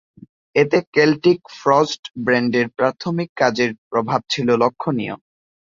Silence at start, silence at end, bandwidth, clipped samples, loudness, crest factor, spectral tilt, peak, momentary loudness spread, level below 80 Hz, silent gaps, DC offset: 0.55 s; 0.6 s; 7.6 kHz; under 0.1%; -19 LUFS; 18 dB; -5.5 dB/octave; -2 dBFS; 8 LU; -60 dBFS; 0.87-0.92 s, 1.99-2.03 s, 2.10-2.14 s, 3.29-3.36 s, 3.78-3.91 s; under 0.1%